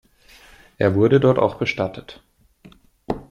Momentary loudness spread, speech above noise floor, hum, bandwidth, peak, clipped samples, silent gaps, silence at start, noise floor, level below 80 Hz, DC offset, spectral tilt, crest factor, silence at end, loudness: 15 LU; 32 dB; none; 11 kHz; -4 dBFS; under 0.1%; none; 0.8 s; -50 dBFS; -50 dBFS; under 0.1%; -8 dB/octave; 18 dB; 0.1 s; -19 LUFS